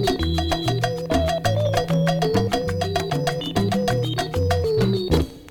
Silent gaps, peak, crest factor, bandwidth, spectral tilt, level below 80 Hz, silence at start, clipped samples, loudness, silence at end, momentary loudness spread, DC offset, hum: none; -4 dBFS; 16 dB; 18.5 kHz; -6 dB/octave; -34 dBFS; 0 s; under 0.1%; -22 LUFS; 0 s; 3 LU; under 0.1%; none